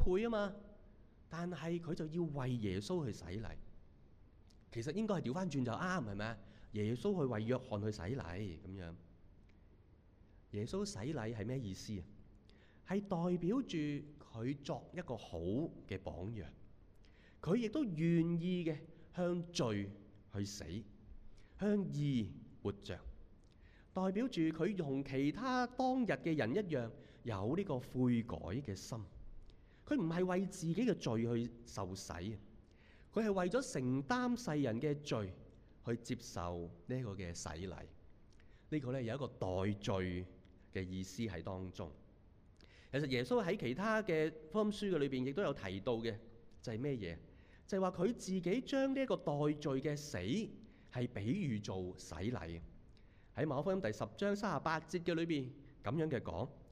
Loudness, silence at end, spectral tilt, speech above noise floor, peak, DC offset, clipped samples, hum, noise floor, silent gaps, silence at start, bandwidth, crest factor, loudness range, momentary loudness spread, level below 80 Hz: -40 LUFS; 0 s; -6.5 dB/octave; 26 dB; -20 dBFS; under 0.1%; under 0.1%; none; -65 dBFS; none; 0 s; 14 kHz; 20 dB; 6 LU; 12 LU; -58 dBFS